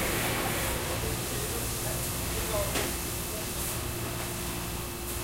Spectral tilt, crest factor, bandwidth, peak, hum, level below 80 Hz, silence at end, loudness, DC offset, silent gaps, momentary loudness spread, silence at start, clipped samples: -3 dB/octave; 16 dB; 16 kHz; -16 dBFS; none; -40 dBFS; 0 s; -31 LUFS; under 0.1%; none; 5 LU; 0 s; under 0.1%